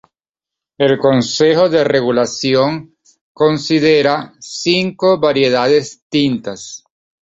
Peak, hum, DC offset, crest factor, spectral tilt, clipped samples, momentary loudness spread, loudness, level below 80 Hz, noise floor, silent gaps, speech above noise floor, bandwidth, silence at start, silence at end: -2 dBFS; none; under 0.1%; 14 dB; -5 dB/octave; under 0.1%; 11 LU; -14 LUFS; -54 dBFS; -86 dBFS; 3.21-3.35 s, 6.02-6.10 s; 73 dB; 8 kHz; 0.8 s; 0.5 s